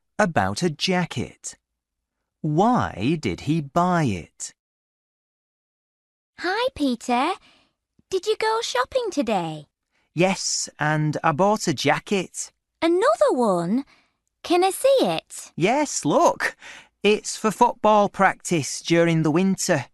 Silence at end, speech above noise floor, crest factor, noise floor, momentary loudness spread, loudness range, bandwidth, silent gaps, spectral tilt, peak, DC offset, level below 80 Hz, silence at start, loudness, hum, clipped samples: 0.1 s; 60 dB; 20 dB; -82 dBFS; 13 LU; 7 LU; 12 kHz; 4.60-6.33 s; -4.5 dB/octave; -4 dBFS; under 0.1%; -58 dBFS; 0.2 s; -22 LUFS; none; under 0.1%